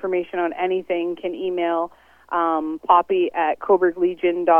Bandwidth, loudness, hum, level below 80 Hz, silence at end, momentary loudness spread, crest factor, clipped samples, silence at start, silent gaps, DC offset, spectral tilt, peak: 3.5 kHz; -21 LUFS; none; -62 dBFS; 0 s; 8 LU; 18 dB; under 0.1%; 0.05 s; none; under 0.1%; -7.5 dB/octave; -2 dBFS